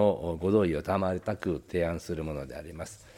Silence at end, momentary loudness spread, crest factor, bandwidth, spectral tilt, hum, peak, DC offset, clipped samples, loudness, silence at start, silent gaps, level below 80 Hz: 0 s; 14 LU; 18 dB; 16 kHz; -7 dB/octave; none; -12 dBFS; under 0.1%; under 0.1%; -30 LUFS; 0 s; none; -50 dBFS